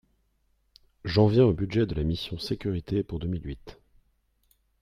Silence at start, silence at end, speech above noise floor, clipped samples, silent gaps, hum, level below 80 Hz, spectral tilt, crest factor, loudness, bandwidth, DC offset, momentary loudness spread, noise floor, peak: 1.05 s; 1.1 s; 45 dB; under 0.1%; none; none; -46 dBFS; -8 dB/octave; 20 dB; -27 LUFS; 12.5 kHz; under 0.1%; 15 LU; -70 dBFS; -10 dBFS